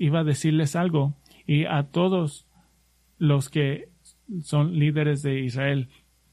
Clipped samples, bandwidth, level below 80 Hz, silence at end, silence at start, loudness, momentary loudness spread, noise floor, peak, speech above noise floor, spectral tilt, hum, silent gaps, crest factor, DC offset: under 0.1%; 12.5 kHz; -60 dBFS; 0.45 s; 0 s; -24 LUFS; 9 LU; -63 dBFS; -10 dBFS; 40 dB; -7 dB/octave; none; none; 14 dB; under 0.1%